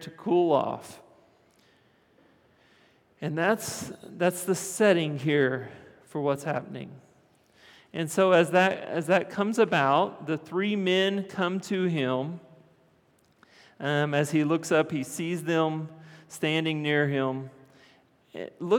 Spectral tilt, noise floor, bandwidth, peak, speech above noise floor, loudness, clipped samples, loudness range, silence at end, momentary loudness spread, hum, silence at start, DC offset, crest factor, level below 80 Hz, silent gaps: -5 dB/octave; -64 dBFS; 19 kHz; -8 dBFS; 38 dB; -27 LUFS; under 0.1%; 7 LU; 0 s; 17 LU; none; 0 s; under 0.1%; 20 dB; -78 dBFS; none